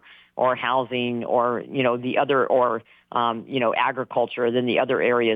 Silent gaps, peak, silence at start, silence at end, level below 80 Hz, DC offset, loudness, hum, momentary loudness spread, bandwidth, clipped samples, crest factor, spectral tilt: none; -8 dBFS; 0.1 s; 0 s; -72 dBFS; under 0.1%; -23 LUFS; none; 5 LU; 4.8 kHz; under 0.1%; 14 dB; -8 dB/octave